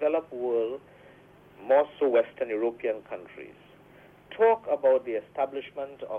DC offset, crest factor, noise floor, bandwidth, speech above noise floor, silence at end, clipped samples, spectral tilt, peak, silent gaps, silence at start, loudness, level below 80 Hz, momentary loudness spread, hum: under 0.1%; 18 dB; -54 dBFS; 3.8 kHz; 26 dB; 0 s; under 0.1%; -7 dB/octave; -12 dBFS; none; 0 s; -27 LUFS; -70 dBFS; 19 LU; none